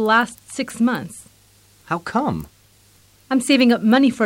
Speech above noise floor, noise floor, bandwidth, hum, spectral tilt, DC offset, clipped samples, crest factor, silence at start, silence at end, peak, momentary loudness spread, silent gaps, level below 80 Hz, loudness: 35 dB; -53 dBFS; 16.5 kHz; none; -4.5 dB/octave; under 0.1%; under 0.1%; 16 dB; 0 s; 0 s; -4 dBFS; 14 LU; none; -54 dBFS; -19 LUFS